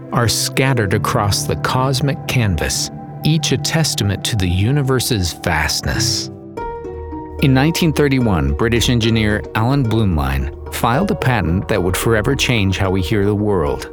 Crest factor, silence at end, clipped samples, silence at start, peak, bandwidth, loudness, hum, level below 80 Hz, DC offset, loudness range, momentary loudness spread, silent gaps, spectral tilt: 14 dB; 0 s; under 0.1%; 0 s; -2 dBFS; over 20 kHz; -16 LUFS; none; -32 dBFS; under 0.1%; 2 LU; 6 LU; none; -5 dB/octave